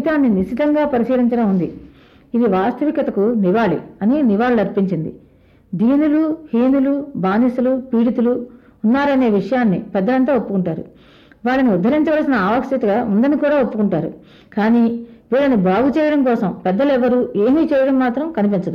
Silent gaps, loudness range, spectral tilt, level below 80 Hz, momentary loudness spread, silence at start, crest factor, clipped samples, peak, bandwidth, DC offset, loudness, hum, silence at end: none; 2 LU; -9 dB/octave; -50 dBFS; 6 LU; 0 s; 12 dB; under 0.1%; -4 dBFS; 6 kHz; under 0.1%; -17 LUFS; none; 0 s